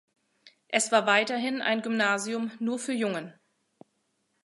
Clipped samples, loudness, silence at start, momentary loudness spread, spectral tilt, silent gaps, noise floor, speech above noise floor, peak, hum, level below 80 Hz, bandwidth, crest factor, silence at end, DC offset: under 0.1%; -27 LUFS; 0.45 s; 9 LU; -3 dB/octave; none; -75 dBFS; 48 dB; -8 dBFS; none; -82 dBFS; 11.5 kHz; 22 dB; 1.15 s; under 0.1%